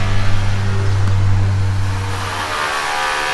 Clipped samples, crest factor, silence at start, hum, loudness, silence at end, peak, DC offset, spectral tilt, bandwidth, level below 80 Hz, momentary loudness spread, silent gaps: under 0.1%; 14 dB; 0 s; none; -18 LUFS; 0 s; -2 dBFS; under 0.1%; -5 dB/octave; 12.5 kHz; -24 dBFS; 5 LU; none